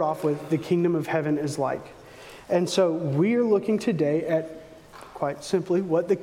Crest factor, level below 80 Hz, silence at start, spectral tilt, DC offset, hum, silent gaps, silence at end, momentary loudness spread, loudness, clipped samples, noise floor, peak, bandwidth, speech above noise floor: 16 dB; -62 dBFS; 0 s; -6.5 dB/octave; under 0.1%; none; none; 0 s; 21 LU; -25 LUFS; under 0.1%; -46 dBFS; -10 dBFS; 16 kHz; 22 dB